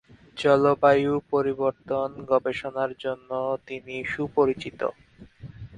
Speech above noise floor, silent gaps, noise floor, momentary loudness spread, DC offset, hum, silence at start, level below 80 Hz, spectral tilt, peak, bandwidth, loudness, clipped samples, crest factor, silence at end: 21 dB; none; -45 dBFS; 13 LU; under 0.1%; none; 0.35 s; -58 dBFS; -7 dB/octave; -4 dBFS; 9.8 kHz; -25 LUFS; under 0.1%; 20 dB; 0 s